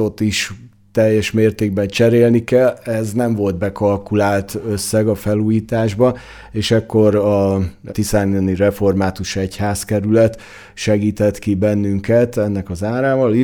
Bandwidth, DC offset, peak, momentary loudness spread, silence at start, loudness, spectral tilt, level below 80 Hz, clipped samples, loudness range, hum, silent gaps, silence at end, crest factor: 18.5 kHz; under 0.1%; -2 dBFS; 8 LU; 0 s; -17 LUFS; -6 dB/octave; -42 dBFS; under 0.1%; 2 LU; none; none; 0 s; 14 dB